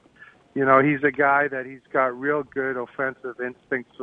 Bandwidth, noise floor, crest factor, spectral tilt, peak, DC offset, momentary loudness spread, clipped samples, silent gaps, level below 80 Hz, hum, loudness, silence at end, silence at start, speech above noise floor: 4.2 kHz; -51 dBFS; 20 dB; -9 dB/octave; -4 dBFS; under 0.1%; 14 LU; under 0.1%; none; -66 dBFS; none; -23 LUFS; 0 s; 0.55 s; 28 dB